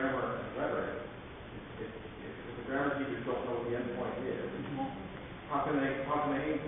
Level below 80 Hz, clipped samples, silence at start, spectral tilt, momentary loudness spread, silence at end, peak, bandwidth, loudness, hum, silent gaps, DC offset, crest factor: -58 dBFS; under 0.1%; 0 s; -2.5 dB/octave; 12 LU; 0 s; -20 dBFS; 3.8 kHz; -37 LUFS; none; none; under 0.1%; 16 dB